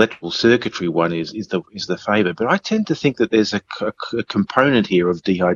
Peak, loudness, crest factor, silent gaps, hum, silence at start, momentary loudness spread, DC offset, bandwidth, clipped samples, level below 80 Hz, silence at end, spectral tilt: 0 dBFS; -19 LUFS; 18 dB; none; none; 0 s; 10 LU; under 0.1%; 7.4 kHz; under 0.1%; -58 dBFS; 0 s; -5.5 dB/octave